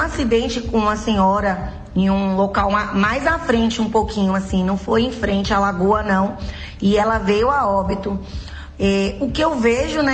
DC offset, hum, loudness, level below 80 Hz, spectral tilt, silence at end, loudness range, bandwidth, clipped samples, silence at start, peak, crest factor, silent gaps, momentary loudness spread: under 0.1%; none; -18 LUFS; -32 dBFS; -6 dB/octave; 0 s; 1 LU; 9 kHz; under 0.1%; 0 s; -6 dBFS; 14 dB; none; 7 LU